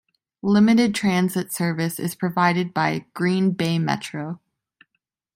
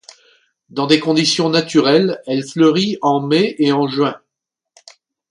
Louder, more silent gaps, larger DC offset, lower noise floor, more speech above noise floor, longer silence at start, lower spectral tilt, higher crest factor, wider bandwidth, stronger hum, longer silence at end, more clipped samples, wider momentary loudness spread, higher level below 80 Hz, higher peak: second, -21 LUFS vs -15 LUFS; neither; neither; second, -77 dBFS vs -81 dBFS; second, 56 dB vs 66 dB; second, 0.45 s vs 0.75 s; about the same, -6 dB/octave vs -5 dB/octave; about the same, 18 dB vs 16 dB; first, 16.5 kHz vs 11 kHz; neither; second, 1 s vs 1.15 s; neither; first, 12 LU vs 8 LU; about the same, -62 dBFS vs -62 dBFS; second, -4 dBFS vs 0 dBFS